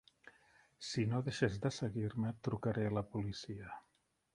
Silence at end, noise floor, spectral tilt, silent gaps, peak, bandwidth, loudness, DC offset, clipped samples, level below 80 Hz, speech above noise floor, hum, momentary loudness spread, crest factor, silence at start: 0.55 s; -79 dBFS; -6.5 dB/octave; none; -20 dBFS; 11.5 kHz; -39 LUFS; under 0.1%; under 0.1%; -64 dBFS; 41 dB; none; 12 LU; 20 dB; 0.25 s